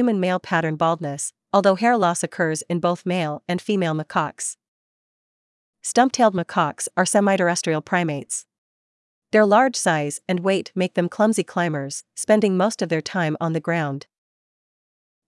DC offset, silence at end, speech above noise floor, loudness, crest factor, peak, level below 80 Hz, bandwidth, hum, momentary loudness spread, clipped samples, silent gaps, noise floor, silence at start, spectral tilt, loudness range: under 0.1%; 1.3 s; over 69 dB; -21 LUFS; 20 dB; -2 dBFS; -72 dBFS; 12 kHz; none; 10 LU; under 0.1%; 4.68-5.73 s, 8.58-9.22 s; under -90 dBFS; 0 s; -4.5 dB/octave; 3 LU